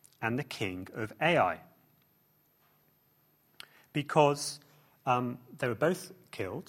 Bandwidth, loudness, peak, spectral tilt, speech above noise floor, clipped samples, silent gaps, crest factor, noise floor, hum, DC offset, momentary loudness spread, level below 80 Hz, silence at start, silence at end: 16.5 kHz; -32 LUFS; -10 dBFS; -5 dB/octave; 38 dB; under 0.1%; none; 24 dB; -69 dBFS; none; under 0.1%; 18 LU; -70 dBFS; 0.2 s; 0.05 s